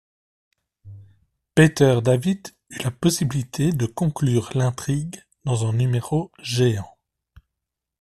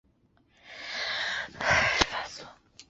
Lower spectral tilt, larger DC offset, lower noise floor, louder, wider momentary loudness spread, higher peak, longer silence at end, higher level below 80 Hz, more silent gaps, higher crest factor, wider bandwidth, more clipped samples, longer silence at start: first, -6 dB/octave vs -0.5 dB/octave; neither; first, -83 dBFS vs -66 dBFS; first, -22 LUFS vs -27 LUFS; second, 12 LU vs 21 LU; about the same, -2 dBFS vs -4 dBFS; first, 1.15 s vs 0.05 s; about the same, -50 dBFS vs -50 dBFS; neither; second, 20 dB vs 28 dB; first, 14 kHz vs 8 kHz; neither; first, 0.85 s vs 0.65 s